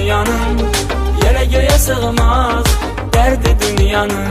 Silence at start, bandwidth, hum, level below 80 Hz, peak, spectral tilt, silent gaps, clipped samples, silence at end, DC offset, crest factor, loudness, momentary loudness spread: 0 s; 15.5 kHz; none; -16 dBFS; 0 dBFS; -4.5 dB/octave; none; under 0.1%; 0 s; under 0.1%; 12 dB; -14 LUFS; 4 LU